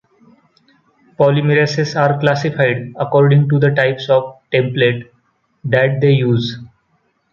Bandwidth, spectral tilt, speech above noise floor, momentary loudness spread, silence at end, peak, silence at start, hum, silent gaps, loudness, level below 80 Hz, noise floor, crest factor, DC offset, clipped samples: 7 kHz; -7 dB/octave; 48 dB; 7 LU; 0.65 s; 0 dBFS; 1.2 s; none; none; -15 LUFS; -54 dBFS; -62 dBFS; 16 dB; under 0.1%; under 0.1%